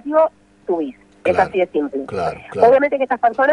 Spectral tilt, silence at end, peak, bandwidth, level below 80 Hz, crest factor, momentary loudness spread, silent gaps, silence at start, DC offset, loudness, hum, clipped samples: -6.5 dB/octave; 0 s; 0 dBFS; 10.5 kHz; -54 dBFS; 16 dB; 11 LU; none; 0.05 s; under 0.1%; -18 LUFS; none; under 0.1%